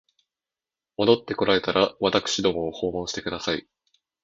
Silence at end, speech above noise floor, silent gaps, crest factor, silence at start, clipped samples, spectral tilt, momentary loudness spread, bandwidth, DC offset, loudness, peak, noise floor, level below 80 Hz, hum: 0.65 s; over 66 dB; none; 22 dB; 1 s; under 0.1%; -4 dB/octave; 8 LU; 8 kHz; under 0.1%; -24 LUFS; -2 dBFS; under -90 dBFS; -54 dBFS; none